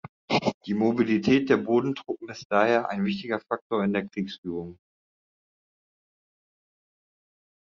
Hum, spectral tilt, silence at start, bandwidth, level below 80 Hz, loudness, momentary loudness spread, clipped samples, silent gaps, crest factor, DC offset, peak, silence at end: none; -4.5 dB/octave; 0.05 s; 7.4 kHz; -66 dBFS; -26 LUFS; 12 LU; under 0.1%; 0.09-0.28 s, 0.54-0.61 s, 2.45-2.50 s, 3.61-3.70 s, 4.38-4.43 s; 20 dB; under 0.1%; -8 dBFS; 2.95 s